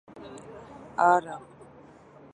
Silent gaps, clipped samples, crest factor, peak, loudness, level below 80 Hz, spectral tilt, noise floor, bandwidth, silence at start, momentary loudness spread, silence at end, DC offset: none; under 0.1%; 22 dB; -8 dBFS; -24 LUFS; -66 dBFS; -5.5 dB/octave; -52 dBFS; 10 kHz; 0.15 s; 23 LU; 0.95 s; under 0.1%